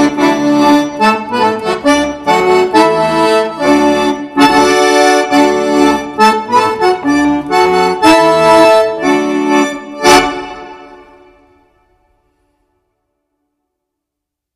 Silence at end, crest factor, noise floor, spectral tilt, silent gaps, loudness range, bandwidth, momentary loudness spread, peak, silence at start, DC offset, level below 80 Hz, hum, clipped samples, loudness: 3.6 s; 12 dB; -79 dBFS; -4 dB/octave; none; 5 LU; 15 kHz; 6 LU; 0 dBFS; 0 s; under 0.1%; -42 dBFS; none; 0.4%; -10 LUFS